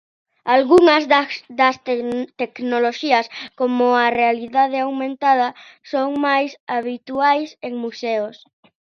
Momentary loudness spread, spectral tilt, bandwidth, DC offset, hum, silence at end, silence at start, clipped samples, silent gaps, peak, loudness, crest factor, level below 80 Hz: 13 LU; -4 dB/octave; 9.8 kHz; under 0.1%; none; 0.5 s; 0.45 s; under 0.1%; 6.60-6.67 s; 0 dBFS; -18 LUFS; 18 dB; -64 dBFS